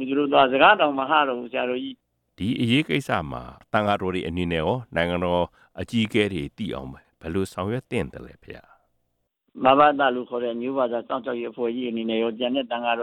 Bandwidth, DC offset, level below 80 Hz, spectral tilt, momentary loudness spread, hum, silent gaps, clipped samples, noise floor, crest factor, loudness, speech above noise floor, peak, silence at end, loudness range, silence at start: 14.5 kHz; under 0.1%; -52 dBFS; -6 dB/octave; 15 LU; none; none; under 0.1%; -74 dBFS; 20 dB; -23 LUFS; 51 dB; -4 dBFS; 0 s; 6 LU; 0 s